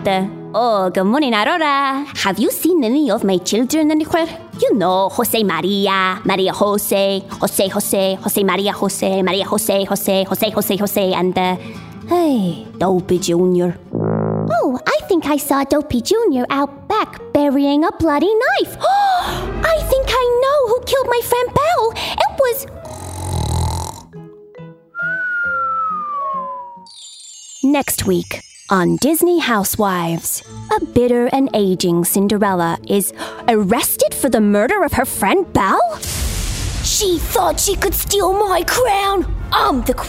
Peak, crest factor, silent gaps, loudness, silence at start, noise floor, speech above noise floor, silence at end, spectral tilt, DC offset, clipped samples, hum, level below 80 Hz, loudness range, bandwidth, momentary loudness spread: -2 dBFS; 14 dB; none; -16 LUFS; 0 s; -38 dBFS; 22 dB; 0 s; -4.5 dB/octave; under 0.1%; under 0.1%; none; -34 dBFS; 4 LU; 16.5 kHz; 7 LU